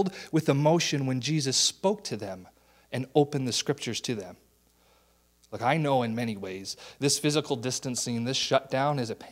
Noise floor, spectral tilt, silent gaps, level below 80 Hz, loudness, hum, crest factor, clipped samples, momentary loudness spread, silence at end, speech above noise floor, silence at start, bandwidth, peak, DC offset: -65 dBFS; -4 dB/octave; none; -68 dBFS; -28 LUFS; none; 20 dB; under 0.1%; 13 LU; 0 s; 37 dB; 0 s; 16 kHz; -8 dBFS; under 0.1%